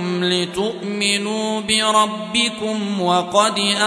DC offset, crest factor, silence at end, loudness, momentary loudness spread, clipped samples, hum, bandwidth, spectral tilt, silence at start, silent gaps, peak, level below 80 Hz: under 0.1%; 18 dB; 0 s; -18 LUFS; 7 LU; under 0.1%; none; 11 kHz; -3 dB/octave; 0 s; none; 0 dBFS; -58 dBFS